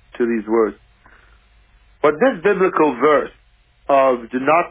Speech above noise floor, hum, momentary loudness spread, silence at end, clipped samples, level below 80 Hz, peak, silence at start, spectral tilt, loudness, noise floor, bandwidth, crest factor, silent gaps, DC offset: 36 dB; none; 6 LU; 0 s; under 0.1%; -54 dBFS; -2 dBFS; 0.15 s; -9.5 dB/octave; -17 LUFS; -52 dBFS; 3.8 kHz; 16 dB; none; under 0.1%